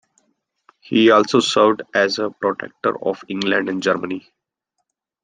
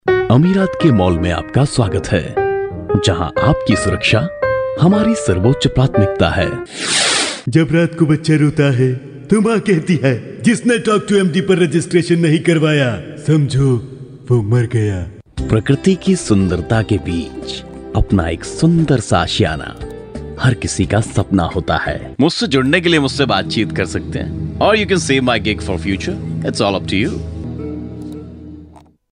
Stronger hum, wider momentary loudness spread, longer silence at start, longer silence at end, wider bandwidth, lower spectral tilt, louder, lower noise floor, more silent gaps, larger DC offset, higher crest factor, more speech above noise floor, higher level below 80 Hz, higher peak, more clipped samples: neither; about the same, 11 LU vs 12 LU; first, 0.9 s vs 0.05 s; first, 1.05 s vs 0.35 s; about the same, 9.6 kHz vs 10.5 kHz; about the same, -4.5 dB/octave vs -5.5 dB/octave; second, -18 LUFS vs -15 LUFS; first, -76 dBFS vs -42 dBFS; neither; neither; about the same, 18 dB vs 14 dB; first, 58 dB vs 28 dB; second, -66 dBFS vs -34 dBFS; about the same, -2 dBFS vs 0 dBFS; neither